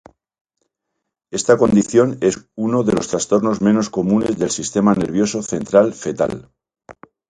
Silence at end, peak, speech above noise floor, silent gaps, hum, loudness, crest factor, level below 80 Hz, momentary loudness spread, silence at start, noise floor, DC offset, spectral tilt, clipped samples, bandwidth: 0.35 s; 0 dBFS; 61 dB; none; none; -17 LUFS; 18 dB; -50 dBFS; 8 LU; 1.3 s; -77 dBFS; under 0.1%; -5.5 dB/octave; under 0.1%; 10.5 kHz